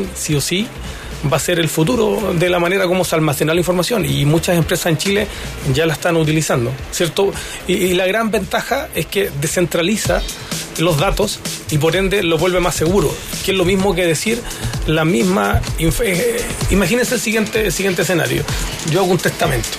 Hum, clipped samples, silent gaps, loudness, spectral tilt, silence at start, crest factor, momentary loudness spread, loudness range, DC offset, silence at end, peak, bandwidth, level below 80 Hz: none; under 0.1%; none; -16 LUFS; -4.5 dB/octave; 0 s; 14 dB; 5 LU; 2 LU; under 0.1%; 0 s; -2 dBFS; 15.5 kHz; -32 dBFS